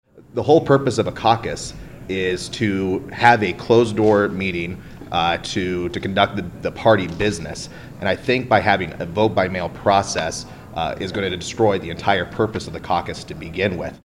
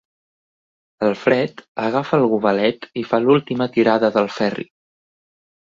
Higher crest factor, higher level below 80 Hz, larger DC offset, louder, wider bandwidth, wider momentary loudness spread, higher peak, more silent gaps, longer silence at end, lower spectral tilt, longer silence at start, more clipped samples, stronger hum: about the same, 20 dB vs 18 dB; first, -44 dBFS vs -62 dBFS; neither; about the same, -20 LUFS vs -19 LUFS; first, 16 kHz vs 7.6 kHz; first, 13 LU vs 9 LU; about the same, 0 dBFS vs -2 dBFS; second, none vs 1.68-1.75 s; second, 0.05 s vs 1.05 s; second, -5 dB/octave vs -7 dB/octave; second, 0.15 s vs 1 s; neither; neither